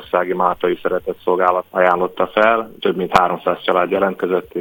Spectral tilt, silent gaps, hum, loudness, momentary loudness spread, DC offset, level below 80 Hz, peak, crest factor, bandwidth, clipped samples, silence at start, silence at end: -6 dB/octave; none; none; -17 LUFS; 5 LU; under 0.1%; -50 dBFS; 0 dBFS; 18 dB; 17 kHz; under 0.1%; 0 s; 0 s